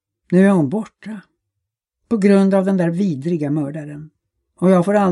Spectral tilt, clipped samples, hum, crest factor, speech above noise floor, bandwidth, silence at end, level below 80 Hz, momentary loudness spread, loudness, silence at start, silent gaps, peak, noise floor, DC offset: -8.5 dB/octave; under 0.1%; none; 16 dB; 64 dB; 11 kHz; 0 s; -64 dBFS; 20 LU; -17 LUFS; 0.3 s; none; -2 dBFS; -80 dBFS; under 0.1%